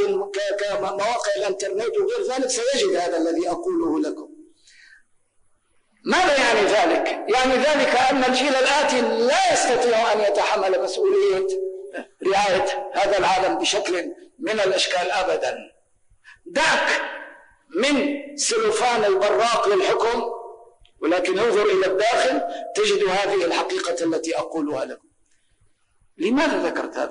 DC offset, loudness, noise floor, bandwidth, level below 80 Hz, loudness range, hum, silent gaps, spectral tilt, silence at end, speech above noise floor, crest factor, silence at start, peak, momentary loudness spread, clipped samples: under 0.1%; -21 LUFS; -63 dBFS; 10 kHz; -56 dBFS; 6 LU; none; none; -2 dB/octave; 0 s; 42 dB; 10 dB; 0 s; -10 dBFS; 9 LU; under 0.1%